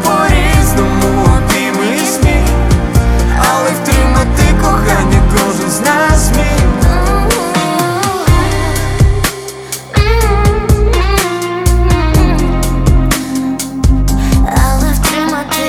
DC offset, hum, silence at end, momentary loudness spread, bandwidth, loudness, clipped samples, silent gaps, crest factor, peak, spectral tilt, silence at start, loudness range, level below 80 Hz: under 0.1%; none; 0 s; 4 LU; 17 kHz; -11 LUFS; under 0.1%; none; 10 dB; 0 dBFS; -5 dB/octave; 0 s; 2 LU; -14 dBFS